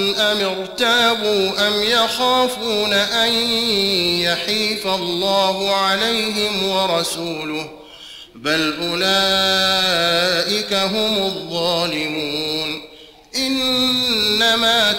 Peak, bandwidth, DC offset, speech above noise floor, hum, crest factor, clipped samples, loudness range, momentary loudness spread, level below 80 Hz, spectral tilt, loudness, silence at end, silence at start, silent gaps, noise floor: -6 dBFS; 16.5 kHz; under 0.1%; 21 dB; none; 14 dB; under 0.1%; 3 LU; 8 LU; -50 dBFS; -2.5 dB/octave; -17 LUFS; 0 s; 0 s; none; -39 dBFS